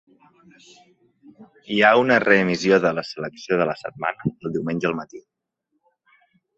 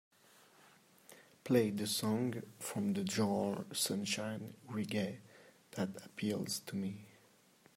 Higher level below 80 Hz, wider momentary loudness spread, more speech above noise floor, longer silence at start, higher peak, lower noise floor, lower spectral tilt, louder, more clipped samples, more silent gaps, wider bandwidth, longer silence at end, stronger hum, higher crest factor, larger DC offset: first, -62 dBFS vs -80 dBFS; first, 14 LU vs 11 LU; first, 54 dB vs 30 dB; first, 1.4 s vs 1.1 s; first, -2 dBFS vs -18 dBFS; first, -75 dBFS vs -67 dBFS; about the same, -5.5 dB/octave vs -4.5 dB/octave; first, -20 LUFS vs -38 LUFS; neither; neither; second, 8 kHz vs 16 kHz; first, 1.35 s vs 0.65 s; neither; about the same, 22 dB vs 22 dB; neither